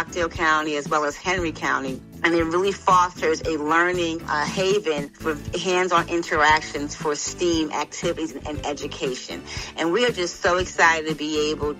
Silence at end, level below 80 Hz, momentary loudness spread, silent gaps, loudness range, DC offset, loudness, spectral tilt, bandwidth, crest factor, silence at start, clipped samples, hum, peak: 0 s; -44 dBFS; 11 LU; none; 4 LU; under 0.1%; -22 LUFS; -3.5 dB/octave; 15.5 kHz; 18 dB; 0 s; under 0.1%; none; -4 dBFS